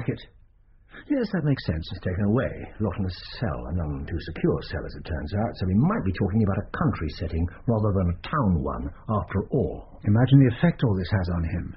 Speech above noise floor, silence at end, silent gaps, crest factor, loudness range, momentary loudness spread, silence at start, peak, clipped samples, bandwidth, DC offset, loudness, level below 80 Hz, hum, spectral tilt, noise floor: 31 dB; 0 s; none; 20 dB; 5 LU; 9 LU; 0 s; -6 dBFS; under 0.1%; 5.8 kHz; under 0.1%; -26 LUFS; -40 dBFS; none; -7.5 dB/octave; -55 dBFS